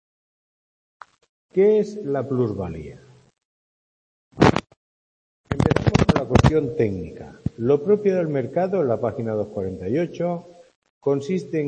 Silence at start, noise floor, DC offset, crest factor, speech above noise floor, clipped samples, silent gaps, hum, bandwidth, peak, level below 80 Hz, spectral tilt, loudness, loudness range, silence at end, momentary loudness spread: 1.55 s; under -90 dBFS; under 0.1%; 22 dB; over 69 dB; under 0.1%; 3.45-4.31 s, 4.77-5.44 s, 10.76-10.82 s, 10.90-11.01 s; none; 8.8 kHz; 0 dBFS; -40 dBFS; -7.5 dB/octave; -22 LUFS; 5 LU; 0 s; 13 LU